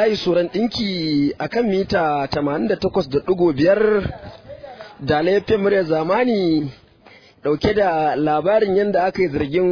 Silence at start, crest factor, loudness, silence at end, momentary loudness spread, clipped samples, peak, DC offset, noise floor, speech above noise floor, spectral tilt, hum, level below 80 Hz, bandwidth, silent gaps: 0 s; 14 dB; -19 LUFS; 0 s; 12 LU; under 0.1%; -4 dBFS; under 0.1%; -48 dBFS; 30 dB; -7 dB/octave; none; -44 dBFS; 5.4 kHz; none